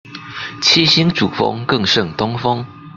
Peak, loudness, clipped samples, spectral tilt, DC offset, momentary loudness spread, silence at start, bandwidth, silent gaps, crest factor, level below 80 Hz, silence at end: 0 dBFS; -14 LUFS; under 0.1%; -4 dB/octave; under 0.1%; 15 LU; 0.05 s; 7.6 kHz; none; 16 dB; -50 dBFS; 0.05 s